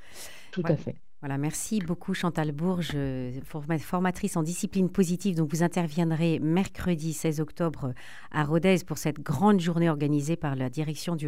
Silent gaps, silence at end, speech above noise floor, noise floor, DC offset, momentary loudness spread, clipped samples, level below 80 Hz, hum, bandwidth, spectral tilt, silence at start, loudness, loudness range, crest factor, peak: none; 0 s; 19 dB; -47 dBFS; 0.9%; 11 LU; under 0.1%; -52 dBFS; none; 16 kHz; -6 dB/octave; 0.1 s; -28 LUFS; 4 LU; 18 dB; -10 dBFS